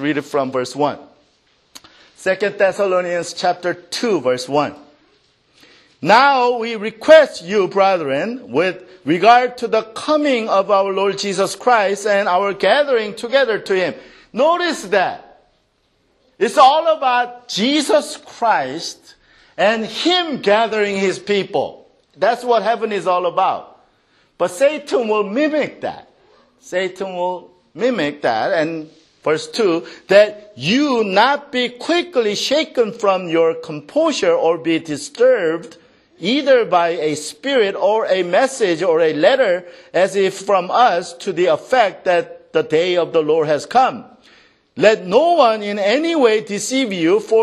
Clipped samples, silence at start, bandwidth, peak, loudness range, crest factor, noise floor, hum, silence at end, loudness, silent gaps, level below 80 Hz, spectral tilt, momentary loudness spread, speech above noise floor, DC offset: under 0.1%; 0 s; 13 kHz; 0 dBFS; 5 LU; 16 dB; -62 dBFS; none; 0 s; -17 LUFS; none; -66 dBFS; -4 dB/octave; 9 LU; 46 dB; under 0.1%